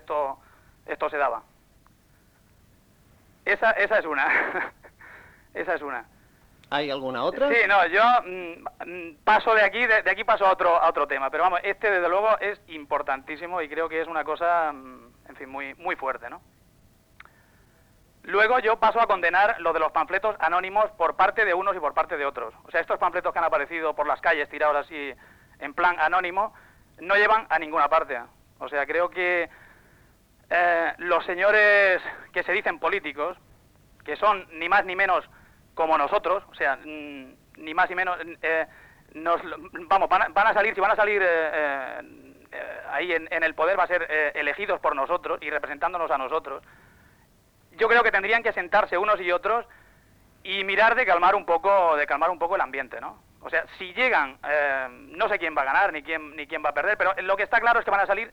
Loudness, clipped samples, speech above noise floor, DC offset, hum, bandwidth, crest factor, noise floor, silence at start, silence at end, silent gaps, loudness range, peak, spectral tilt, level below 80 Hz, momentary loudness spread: -23 LUFS; under 0.1%; 36 dB; under 0.1%; none; 19.5 kHz; 16 dB; -60 dBFS; 0.1 s; 0 s; none; 6 LU; -8 dBFS; -4.5 dB/octave; -58 dBFS; 15 LU